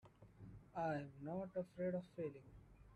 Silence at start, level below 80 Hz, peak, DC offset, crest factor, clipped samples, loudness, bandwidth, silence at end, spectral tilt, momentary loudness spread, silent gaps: 0.05 s; -70 dBFS; -32 dBFS; under 0.1%; 16 dB; under 0.1%; -47 LUFS; 10.5 kHz; 0 s; -9 dB/octave; 19 LU; none